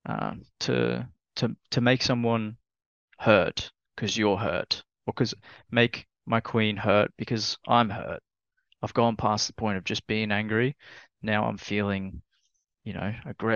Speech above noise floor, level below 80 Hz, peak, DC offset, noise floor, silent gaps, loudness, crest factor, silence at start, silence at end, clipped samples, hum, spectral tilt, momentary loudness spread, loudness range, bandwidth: 48 dB; -58 dBFS; -4 dBFS; under 0.1%; -74 dBFS; 2.86-3.08 s; -27 LUFS; 24 dB; 0.05 s; 0 s; under 0.1%; none; -5 dB/octave; 14 LU; 3 LU; 7.2 kHz